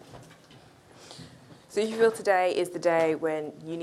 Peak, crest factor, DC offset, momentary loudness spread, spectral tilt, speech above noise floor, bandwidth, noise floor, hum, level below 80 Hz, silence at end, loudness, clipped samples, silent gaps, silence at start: -10 dBFS; 18 dB; under 0.1%; 22 LU; -4.5 dB/octave; 28 dB; 13.5 kHz; -54 dBFS; none; -70 dBFS; 0 s; -26 LUFS; under 0.1%; none; 0.1 s